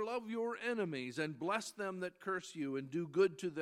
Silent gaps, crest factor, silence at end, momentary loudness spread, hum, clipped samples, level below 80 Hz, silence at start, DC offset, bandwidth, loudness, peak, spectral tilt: none; 18 dB; 0 s; 8 LU; none; under 0.1%; -86 dBFS; 0 s; under 0.1%; 13.5 kHz; -39 LUFS; -20 dBFS; -5 dB/octave